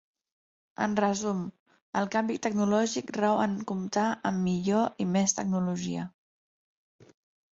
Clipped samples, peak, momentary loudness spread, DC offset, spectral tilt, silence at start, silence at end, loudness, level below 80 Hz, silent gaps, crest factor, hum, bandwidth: under 0.1%; -10 dBFS; 9 LU; under 0.1%; -5 dB/octave; 0.8 s; 1.45 s; -29 LUFS; -68 dBFS; 1.60-1.66 s, 1.82-1.93 s; 18 dB; none; 8 kHz